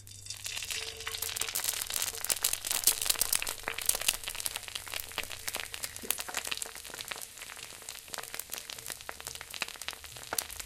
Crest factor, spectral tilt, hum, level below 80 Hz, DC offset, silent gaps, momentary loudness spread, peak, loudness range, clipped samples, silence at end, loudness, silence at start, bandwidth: 32 dB; 1 dB/octave; none; -56 dBFS; under 0.1%; none; 13 LU; -4 dBFS; 10 LU; under 0.1%; 0 s; -33 LUFS; 0 s; 17 kHz